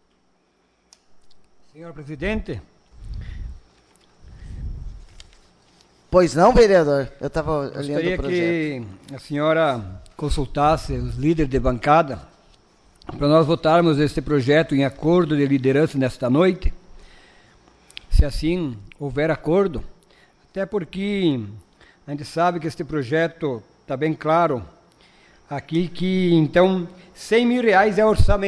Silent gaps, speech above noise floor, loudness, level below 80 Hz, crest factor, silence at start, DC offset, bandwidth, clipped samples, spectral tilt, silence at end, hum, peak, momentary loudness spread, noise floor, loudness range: none; 44 dB; -20 LUFS; -32 dBFS; 18 dB; 1.15 s; under 0.1%; 11 kHz; under 0.1%; -7 dB/octave; 0 s; none; -4 dBFS; 19 LU; -64 dBFS; 15 LU